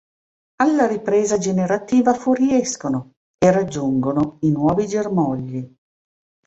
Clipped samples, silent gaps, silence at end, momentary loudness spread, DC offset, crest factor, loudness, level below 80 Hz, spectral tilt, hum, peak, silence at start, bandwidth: under 0.1%; 3.17-3.38 s; 0.8 s; 8 LU; under 0.1%; 18 dB; -19 LUFS; -54 dBFS; -6 dB/octave; none; -2 dBFS; 0.6 s; 8.2 kHz